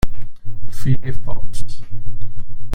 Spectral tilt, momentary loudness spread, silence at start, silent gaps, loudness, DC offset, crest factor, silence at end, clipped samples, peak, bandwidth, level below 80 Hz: -6.5 dB/octave; 16 LU; 0.05 s; none; -28 LUFS; under 0.1%; 8 dB; 0 s; under 0.1%; -2 dBFS; 10 kHz; -28 dBFS